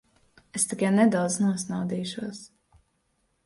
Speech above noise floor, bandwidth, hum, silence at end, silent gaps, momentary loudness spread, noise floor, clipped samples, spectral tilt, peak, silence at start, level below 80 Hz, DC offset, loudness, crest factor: 47 dB; 11.5 kHz; none; 1 s; none; 15 LU; -72 dBFS; under 0.1%; -5 dB/octave; -10 dBFS; 0.55 s; -66 dBFS; under 0.1%; -26 LUFS; 18 dB